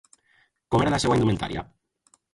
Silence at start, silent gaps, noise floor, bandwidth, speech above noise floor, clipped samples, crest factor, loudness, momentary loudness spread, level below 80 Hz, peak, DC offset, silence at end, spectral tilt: 0.7 s; none; -65 dBFS; 11.5 kHz; 42 dB; under 0.1%; 18 dB; -24 LUFS; 13 LU; -46 dBFS; -8 dBFS; under 0.1%; 0.7 s; -6 dB/octave